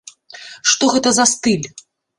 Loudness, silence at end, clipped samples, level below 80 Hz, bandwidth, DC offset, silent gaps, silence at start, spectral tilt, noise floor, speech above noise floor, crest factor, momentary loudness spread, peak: -15 LUFS; 0.4 s; under 0.1%; -56 dBFS; 11.5 kHz; under 0.1%; none; 0.35 s; -2 dB/octave; -38 dBFS; 23 dB; 18 dB; 20 LU; 0 dBFS